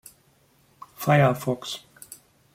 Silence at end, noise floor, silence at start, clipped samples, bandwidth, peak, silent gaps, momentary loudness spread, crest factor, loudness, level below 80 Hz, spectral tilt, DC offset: 0.75 s; -62 dBFS; 1 s; under 0.1%; 16 kHz; -6 dBFS; none; 24 LU; 20 dB; -23 LUFS; -64 dBFS; -6 dB/octave; under 0.1%